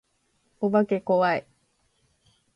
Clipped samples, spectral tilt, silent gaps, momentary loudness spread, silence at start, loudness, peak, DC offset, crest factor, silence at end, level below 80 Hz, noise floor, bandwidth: under 0.1%; -8 dB/octave; none; 8 LU; 0.6 s; -24 LUFS; -10 dBFS; under 0.1%; 16 dB; 1.15 s; -72 dBFS; -70 dBFS; 6.8 kHz